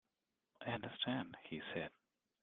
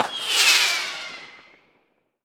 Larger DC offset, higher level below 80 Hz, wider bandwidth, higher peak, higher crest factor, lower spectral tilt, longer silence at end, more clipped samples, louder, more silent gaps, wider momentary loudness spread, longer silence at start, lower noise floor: neither; about the same, -78 dBFS vs -80 dBFS; second, 4.3 kHz vs over 20 kHz; second, -26 dBFS vs 0 dBFS; about the same, 22 dB vs 24 dB; first, -3 dB/octave vs 2.5 dB/octave; second, 0.55 s vs 0.9 s; neither; second, -45 LUFS vs -18 LUFS; neither; second, 9 LU vs 20 LU; first, 0.6 s vs 0 s; first, -90 dBFS vs -67 dBFS